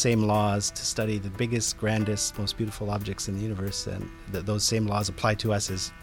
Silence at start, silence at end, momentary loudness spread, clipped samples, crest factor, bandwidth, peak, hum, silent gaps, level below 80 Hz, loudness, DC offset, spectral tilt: 0 s; 0 s; 7 LU; under 0.1%; 18 dB; 17 kHz; -10 dBFS; none; none; -46 dBFS; -28 LUFS; under 0.1%; -4 dB/octave